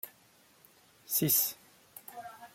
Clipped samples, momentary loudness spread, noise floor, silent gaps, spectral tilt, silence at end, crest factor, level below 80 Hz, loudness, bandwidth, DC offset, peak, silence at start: under 0.1%; 25 LU; -64 dBFS; none; -3 dB/octave; 0.05 s; 22 dB; -76 dBFS; -28 LUFS; 16.5 kHz; under 0.1%; -14 dBFS; 0.05 s